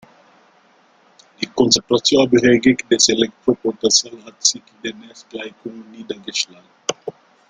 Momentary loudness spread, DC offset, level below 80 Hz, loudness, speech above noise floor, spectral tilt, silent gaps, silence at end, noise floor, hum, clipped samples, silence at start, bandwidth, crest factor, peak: 20 LU; under 0.1%; -56 dBFS; -16 LUFS; 36 dB; -2.5 dB/octave; none; 0.4 s; -54 dBFS; none; under 0.1%; 1.4 s; 10.5 kHz; 20 dB; 0 dBFS